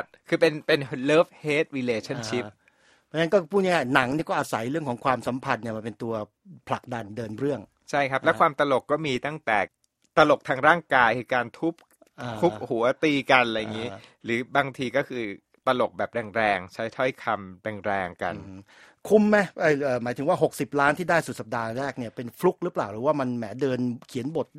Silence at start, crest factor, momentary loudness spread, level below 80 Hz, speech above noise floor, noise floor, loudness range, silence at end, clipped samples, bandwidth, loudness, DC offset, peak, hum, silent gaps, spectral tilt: 0 s; 24 dB; 12 LU; -62 dBFS; 37 dB; -62 dBFS; 5 LU; 0 s; under 0.1%; 15.5 kHz; -25 LUFS; under 0.1%; -2 dBFS; none; none; -5.5 dB/octave